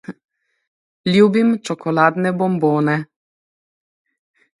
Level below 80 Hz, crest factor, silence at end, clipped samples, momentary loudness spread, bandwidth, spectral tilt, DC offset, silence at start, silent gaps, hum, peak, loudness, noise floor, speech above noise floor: -64 dBFS; 18 dB; 1.55 s; under 0.1%; 11 LU; 11.5 kHz; -7 dB/octave; under 0.1%; 0.1 s; 0.25-0.29 s, 0.67-1.04 s; none; 0 dBFS; -17 LUFS; under -90 dBFS; over 74 dB